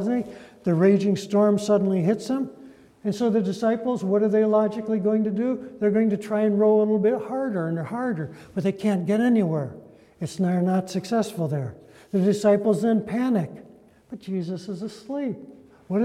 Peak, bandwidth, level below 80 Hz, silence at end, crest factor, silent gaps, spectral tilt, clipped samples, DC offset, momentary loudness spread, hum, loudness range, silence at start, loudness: -8 dBFS; 13 kHz; -66 dBFS; 0 s; 16 dB; none; -7.5 dB/octave; under 0.1%; under 0.1%; 12 LU; none; 3 LU; 0 s; -24 LUFS